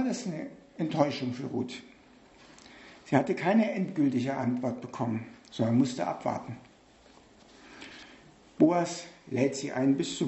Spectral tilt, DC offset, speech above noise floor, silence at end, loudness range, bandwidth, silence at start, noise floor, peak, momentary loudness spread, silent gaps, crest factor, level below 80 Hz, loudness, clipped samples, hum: -6 dB/octave; under 0.1%; 29 dB; 0 s; 4 LU; 8.2 kHz; 0 s; -58 dBFS; -8 dBFS; 20 LU; none; 22 dB; -70 dBFS; -30 LUFS; under 0.1%; none